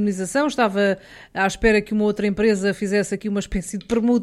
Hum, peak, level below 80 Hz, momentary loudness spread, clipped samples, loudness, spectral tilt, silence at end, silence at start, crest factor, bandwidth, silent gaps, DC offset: none; -4 dBFS; -40 dBFS; 7 LU; under 0.1%; -21 LUFS; -5 dB/octave; 0 s; 0 s; 16 dB; 13.5 kHz; none; under 0.1%